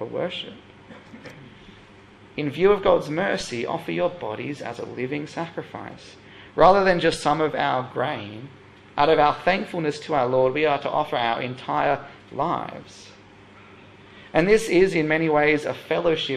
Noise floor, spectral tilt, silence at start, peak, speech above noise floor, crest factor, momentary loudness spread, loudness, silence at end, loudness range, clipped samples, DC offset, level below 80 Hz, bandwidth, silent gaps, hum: -48 dBFS; -5.5 dB/octave; 0 s; -2 dBFS; 26 dB; 20 dB; 19 LU; -22 LUFS; 0 s; 5 LU; under 0.1%; under 0.1%; -52 dBFS; 14 kHz; none; none